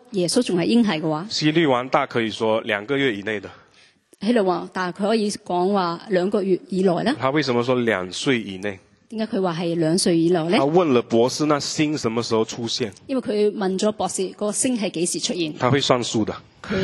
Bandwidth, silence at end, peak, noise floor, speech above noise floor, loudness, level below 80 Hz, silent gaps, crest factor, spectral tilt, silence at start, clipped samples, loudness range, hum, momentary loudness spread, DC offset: 12.5 kHz; 0 s; -2 dBFS; -55 dBFS; 34 dB; -21 LUFS; -60 dBFS; none; 20 dB; -4.5 dB/octave; 0.1 s; under 0.1%; 3 LU; none; 8 LU; under 0.1%